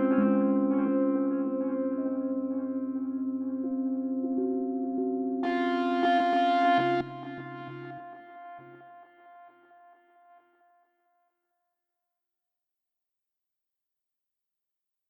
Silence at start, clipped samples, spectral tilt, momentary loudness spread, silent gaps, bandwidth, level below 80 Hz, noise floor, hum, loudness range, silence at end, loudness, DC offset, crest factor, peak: 0 s; under 0.1%; -7.5 dB/octave; 17 LU; none; 6 kHz; -76 dBFS; -87 dBFS; none; 17 LU; 5.6 s; -28 LUFS; under 0.1%; 18 dB; -12 dBFS